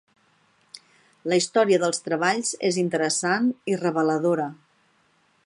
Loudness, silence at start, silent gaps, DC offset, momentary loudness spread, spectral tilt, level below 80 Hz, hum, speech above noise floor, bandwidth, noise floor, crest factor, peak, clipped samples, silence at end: -23 LUFS; 0.75 s; none; under 0.1%; 5 LU; -4 dB/octave; -76 dBFS; none; 41 dB; 11.5 kHz; -64 dBFS; 18 dB; -8 dBFS; under 0.1%; 0.9 s